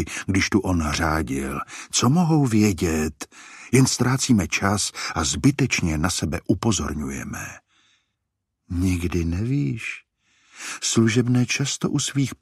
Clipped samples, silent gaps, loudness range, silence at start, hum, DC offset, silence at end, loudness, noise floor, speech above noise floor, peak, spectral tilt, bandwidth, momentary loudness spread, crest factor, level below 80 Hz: under 0.1%; none; 7 LU; 0 s; none; under 0.1%; 0.1 s; -22 LUFS; -79 dBFS; 57 dB; -4 dBFS; -4.5 dB/octave; 15 kHz; 13 LU; 18 dB; -40 dBFS